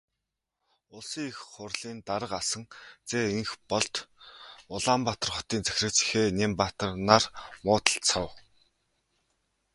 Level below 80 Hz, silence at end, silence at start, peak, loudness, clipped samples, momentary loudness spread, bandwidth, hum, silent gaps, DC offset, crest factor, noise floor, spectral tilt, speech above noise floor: -56 dBFS; 1.35 s; 0.95 s; 0 dBFS; -28 LUFS; under 0.1%; 18 LU; 11.5 kHz; none; none; under 0.1%; 30 dB; -85 dBFS; -3 dB/octave; 56 dB